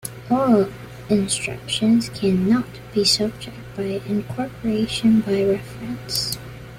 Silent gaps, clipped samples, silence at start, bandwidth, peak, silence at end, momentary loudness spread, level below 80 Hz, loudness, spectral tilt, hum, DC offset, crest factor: none; under 0.1%; 0.05 s; 16 kHz; -4 dBFS; 0 s; 12 LU; -48 dBFS; -21 LUFS; -4.5 dB/octave; none; under 0.1%; 16 dB